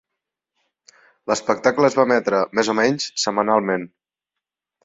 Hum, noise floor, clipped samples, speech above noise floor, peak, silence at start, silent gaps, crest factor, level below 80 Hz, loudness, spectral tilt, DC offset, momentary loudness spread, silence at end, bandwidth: none; -85 dBFS; under 0.1%; 66 dB; -2 dBFS; 1.25 s; none; 20 dB; -64 dBFS; -19 LUFS; -4 dB/octave; under 0.1%; 8 LU; 1 s; 7.8 kHz